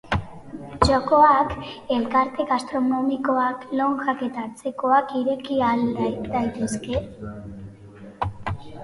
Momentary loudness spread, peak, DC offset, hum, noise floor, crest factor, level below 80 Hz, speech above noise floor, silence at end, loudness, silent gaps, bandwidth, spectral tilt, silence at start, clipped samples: 18 LU; -2 dBFS; under 0.1%; none; -43 dBFS; 22 dB; -42 dBFS; 21 dB; 0 s; -23 LUFS; none; 11.5 kHz; -6 dB/octave; 0.05 s; under 0.1%